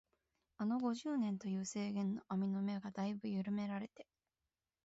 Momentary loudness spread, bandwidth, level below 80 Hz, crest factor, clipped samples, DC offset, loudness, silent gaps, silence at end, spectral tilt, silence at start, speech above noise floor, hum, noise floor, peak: 5 LU; 8 kHz; -80 dBFS; 14 dB; under 0.1%; under 0.1%; -41 LUFS; none; 0.85 s; -7 dB/octave; 0.6 s; over 50 dB; none; under -90 dBFS; -28 dBFS